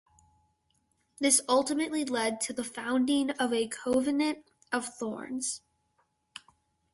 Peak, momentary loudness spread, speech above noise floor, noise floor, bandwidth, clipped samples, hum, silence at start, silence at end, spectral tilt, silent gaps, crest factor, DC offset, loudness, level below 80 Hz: -8 dBFS; 17 LU; 45 dB; -74 dBFS; 12 kHz; under 0.1%; none; 1.2 s; 1.35 s; -2 dB/octave; none; 24 dB; under 0.1%; -29 LUFS; -70 dBFS